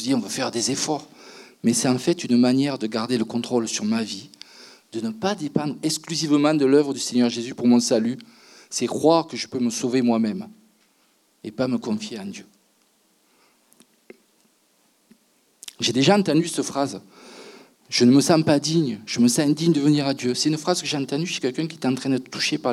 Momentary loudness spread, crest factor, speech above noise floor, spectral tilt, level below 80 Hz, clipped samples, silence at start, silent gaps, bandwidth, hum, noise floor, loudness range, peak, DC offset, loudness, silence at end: 16 LU; 20 dB; 42 dB; -4.5 dB/octave; -74 dBFS; under 0.1%; 0 s; none; 14 kHz; none; -63 dBFS; 12 LU; -4 dBFS; under 0.1%; -22 LUFS; 0 s